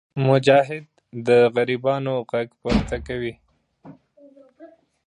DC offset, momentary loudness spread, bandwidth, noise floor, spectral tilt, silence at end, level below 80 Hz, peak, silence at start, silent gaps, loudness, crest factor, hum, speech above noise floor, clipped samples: under 0.1%; 13 LU; 10 kHz; -51 dBFS; -7 dB/octave; 0.4 s; -42 dBFS; -2 dBFS; 0.15 s; none; -21 LUFS; 20 dB; none; 31 dB; under 0.1%